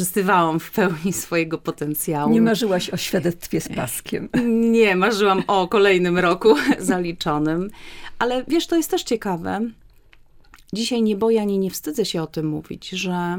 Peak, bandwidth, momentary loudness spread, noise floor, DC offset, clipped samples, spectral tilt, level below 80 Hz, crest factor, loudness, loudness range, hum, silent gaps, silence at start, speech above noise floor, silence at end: -2 dBFS; 17.5 kHz; 10 LU; -49 dBFS; under 0.1%; under 0.1%; -5 dB/octave; -50 dBFS; 18 dB; -20 LUFS; 6 LU; none; none; 0 s; 29 dB; 0 s